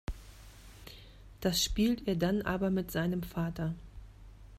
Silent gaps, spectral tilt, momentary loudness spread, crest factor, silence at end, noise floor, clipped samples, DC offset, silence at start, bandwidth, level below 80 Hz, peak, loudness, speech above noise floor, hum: none; -5 dB/octave; 24 LU; 18 dB; 0 s; -52 dBFS; under 0.1%; under 0.1%; 0.1 s; 15.5 kHz; -48 dBFS; -16 dBFS; -32 LUFS; 21 dB; none